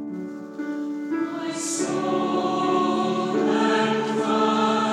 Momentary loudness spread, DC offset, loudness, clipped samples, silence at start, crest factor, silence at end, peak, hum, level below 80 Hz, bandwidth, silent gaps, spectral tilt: 10 LU; under 0.1%; -23 LUFS; under 0.1%; 0 s; 14 dB; 0 s; -10 dBFS; none; -72 dBFS; 13 kHz; none; -4.5 dB/octave